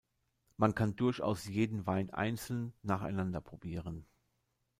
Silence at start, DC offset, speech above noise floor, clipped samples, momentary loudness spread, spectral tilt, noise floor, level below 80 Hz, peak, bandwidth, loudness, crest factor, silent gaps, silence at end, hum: 0.6 s; under 0.1%; 46 dB; under 0.1%; 11 LU; -7 dB/octave; -81 dBFS; -62 dBFS; -14 dBFS; 16 kHz; -36 LUFS; 22 dB; none; 0.75 s; none